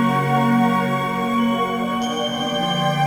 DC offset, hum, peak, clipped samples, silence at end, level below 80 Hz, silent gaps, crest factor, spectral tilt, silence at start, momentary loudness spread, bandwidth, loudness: under 0.1%; none; -6 dBFS; under 0.1%; 0 s; -54 dBFS; none; 14 dB; -5.5 dB/octave; 0 s; 5 LU; 20 kHz; -20 LUFS